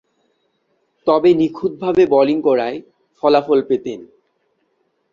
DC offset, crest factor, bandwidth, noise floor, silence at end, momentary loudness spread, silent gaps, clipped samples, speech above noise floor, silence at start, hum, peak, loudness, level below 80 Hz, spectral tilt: under 0.1%; 16 dB; 7.2 kHz; -66 dBFS; 1.1 s; 12 LU; none; under 0.1%; 51 dB; 1.05 s; none; -2 dBFS; -16 LUFS; -58 dBFS; -7.5 dB/octave